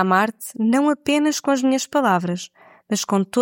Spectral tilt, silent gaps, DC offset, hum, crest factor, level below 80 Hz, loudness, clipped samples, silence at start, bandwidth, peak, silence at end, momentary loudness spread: -4.5 dB/octave; none; under 0.1%; none; 16 dB; -66 dBFS; -20 LUFS; under 0.1%; 0 s; 17 kHz; -4 dBFS; 0 s; 8 LU